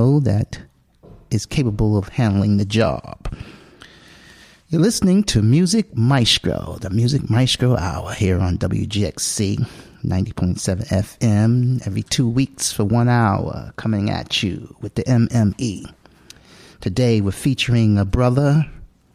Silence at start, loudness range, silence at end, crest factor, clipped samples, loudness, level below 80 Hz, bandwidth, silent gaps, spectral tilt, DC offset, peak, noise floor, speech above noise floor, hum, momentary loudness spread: 0 s; 4 LU; 0.3 s; 16 dB; under 0.1%; -19 LUFS; -38 dBFS; 15 kHz; none; -5.5 dB/octave; under 0.1%; -2 dBFS; -47 dBFS; 29 dB; none; 11 LU